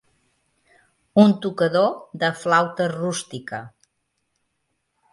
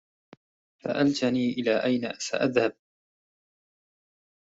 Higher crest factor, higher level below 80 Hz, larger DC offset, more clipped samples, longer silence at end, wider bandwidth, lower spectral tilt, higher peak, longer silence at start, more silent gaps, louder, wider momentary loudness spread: about the same, 22 dB vs 22 dB; about the same, -68 dBFS vs -70 dBFS; neither; neither; second, 1.45 s vs 1.85 s; first, 11.5 kHz vs 8 kHz; about the same, -5.5 dB/octave vs -5 dB/octave; first, -2 dBFS vs -8 dBFS; first, 1.15 s vs 0.85 s; neither; first, -21 LUFS vs -26 LUFS; first, 16 LU vs 6 LU